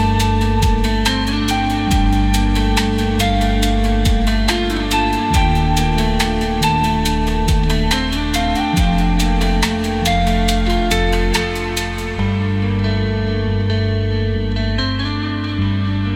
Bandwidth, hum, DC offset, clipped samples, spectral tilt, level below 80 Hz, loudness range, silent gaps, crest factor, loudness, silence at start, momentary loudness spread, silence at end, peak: 16.5 kHz; none; under 0.1%; under 0.1%; -5.5 dB/octave; -20 dBFS; 2 LU; none; 14 dB; -17 LUFS; 0 s; 4 LU; 0 s; -2 dBFS